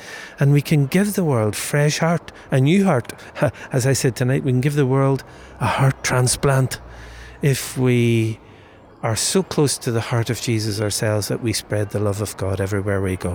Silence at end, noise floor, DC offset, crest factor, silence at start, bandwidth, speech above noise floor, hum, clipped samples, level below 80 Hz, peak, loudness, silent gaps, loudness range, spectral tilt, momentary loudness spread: 0 s; -45 dBFS; under 0.1%; 12 dB; 0 s; over 20 kHz; 26 dB; none; under 0.1%; -48 dBFS; -6 dBFS; -20 LUFS; none; 3 LU; -5.5 dB/octave; 8 LU